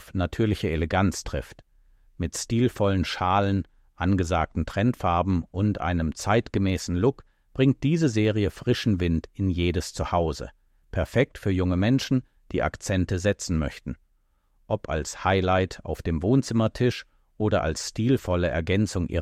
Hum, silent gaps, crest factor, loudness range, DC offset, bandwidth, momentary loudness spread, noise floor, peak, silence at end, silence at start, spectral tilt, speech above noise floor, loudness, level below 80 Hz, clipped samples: none; none; 16 dB; 2 LU; under 0.1%; 14.5 kHz; 9 LU; -66 dBFS; -8 dBFS; 0 s; 0 s; -6 dB/octave; 42 dB; -25 LUFS; -40 dBFS; under 0.1%